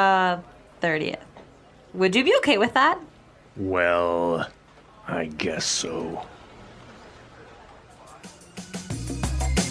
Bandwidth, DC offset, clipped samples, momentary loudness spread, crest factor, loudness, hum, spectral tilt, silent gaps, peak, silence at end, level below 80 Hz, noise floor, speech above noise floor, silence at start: 11 kHz; under 0.1%; under 0.1%; 23 LU; 20 dB; -24 LUFS; none; -4 dB/octave; none; -6 dBFS; 0 s; -40 dBFS; -51 dBFS; 28 dB; 0 s